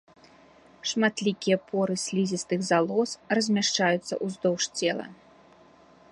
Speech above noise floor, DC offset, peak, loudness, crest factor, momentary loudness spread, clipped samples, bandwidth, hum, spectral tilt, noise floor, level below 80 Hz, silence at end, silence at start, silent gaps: 29 dB; under 0.1%; -8 dBFS; -26 LUFS; 18 dB; 6 LU; under 0.1%; 11.5 kHz; none; -4 dB/octave; -55 dBFS; -72 dBFS; 1 s; 0.85 s; none